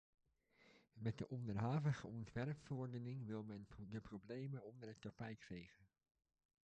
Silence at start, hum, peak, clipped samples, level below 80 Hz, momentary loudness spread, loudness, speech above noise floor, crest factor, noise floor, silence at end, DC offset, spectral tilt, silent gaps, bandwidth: 0.6 s; none; -30 dBFS; under 0.1%; -72 dBFS; 13 LU; -49 LUFS; 27 dB; 18 dB; -75 dBFS; 0.8 s; under 0.1%; -8 dB/octave; none; 8.6 kHz